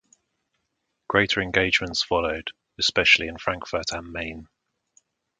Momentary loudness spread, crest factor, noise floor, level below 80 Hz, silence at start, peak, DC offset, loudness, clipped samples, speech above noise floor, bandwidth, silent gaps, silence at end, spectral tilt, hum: 15 LU; 24 dB; -77 dBFS; -48 dBFS; 1.1 s; -2 dBFS; under 0.1%; -22 LUFS; under 0.1%; 53 dB; 9.6 kHz; none; 0.95 s; -3 dB/octave; none